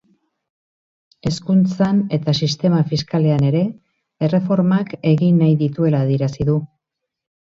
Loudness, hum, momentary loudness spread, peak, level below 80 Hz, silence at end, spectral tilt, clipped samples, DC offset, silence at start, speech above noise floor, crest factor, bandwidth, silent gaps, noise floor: -18 LUFS; none; 7 LU; -4 dBFS; -50 dBFS; 0.8 s; -7.5 dB/octave; under 0.1%; under 0.1%; 1.25 s; 64 dB; 14 dB; 7.8 kHz; none; -81 dBFS